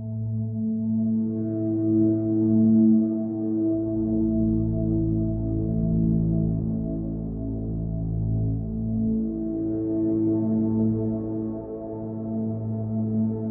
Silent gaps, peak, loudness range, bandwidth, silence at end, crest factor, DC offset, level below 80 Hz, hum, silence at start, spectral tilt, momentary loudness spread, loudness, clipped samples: none; -10 dBFS; 5 LU; 1.6 kHz; 0 s; 14 dB; under 0.1%; -38 dBFS; none; 0 s; -16.5 dB/octave; 8 LU; -25 LUFS; under 0.1%